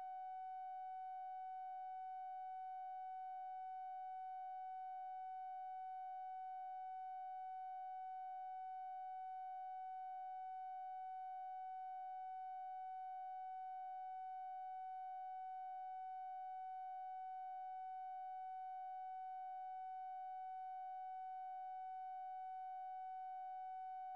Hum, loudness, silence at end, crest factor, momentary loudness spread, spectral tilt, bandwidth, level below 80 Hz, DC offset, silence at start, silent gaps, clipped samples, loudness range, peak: none; -50 LUFS; 0 s; 4 dB; 0 LU; 3 dB/octave; 4.8 kHz; under -90 dBFS; under 0.1%; 0 s; none; under 0.1%; 0 LU; -46 dBFS